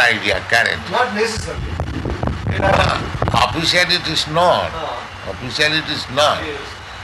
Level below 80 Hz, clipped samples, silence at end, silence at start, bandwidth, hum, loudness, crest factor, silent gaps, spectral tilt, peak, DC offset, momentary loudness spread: -34 dBFS; under 0.1%; 0 s; 0 s; 12 kHz; none; -17 LUFS; 18 dB; none; -4 dB/octave; 0 dBFS; under 0.1%; 12 LU